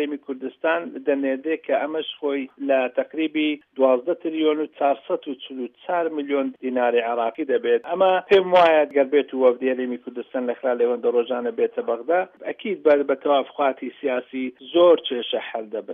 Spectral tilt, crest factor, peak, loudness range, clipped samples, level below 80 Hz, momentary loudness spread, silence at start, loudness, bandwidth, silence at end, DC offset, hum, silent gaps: -6.5 dB/octave; 16 dB; -6 dBFS; 5 LU; under 0.1%; -72 dBFS; 12 LU; 0 s; -22 LUFS; 5.6 kHz; 0 s; under 0.1%; none; none